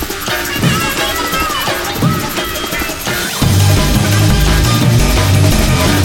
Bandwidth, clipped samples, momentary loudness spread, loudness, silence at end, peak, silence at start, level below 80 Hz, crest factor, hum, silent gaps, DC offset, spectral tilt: 19 kHz; under 0.1%; 6 LU; -13 LUFS; 0 s; 0 dBFS; 0 s; -20 dBFS; 12 dB; none; none; under 0.1%; -4.5 dB/octave